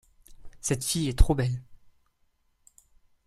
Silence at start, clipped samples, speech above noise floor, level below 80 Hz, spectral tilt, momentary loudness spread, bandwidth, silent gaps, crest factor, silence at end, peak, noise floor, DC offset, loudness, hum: 0.3 s; under 0.1%; 46 dB; -32 dBFS; -5 dB/octave; 9 LU; 15 kHz; none; 26 dB; 1.5 s; -4 dBFS; -70 dBFS; under 0.1%; -28 LUFS; none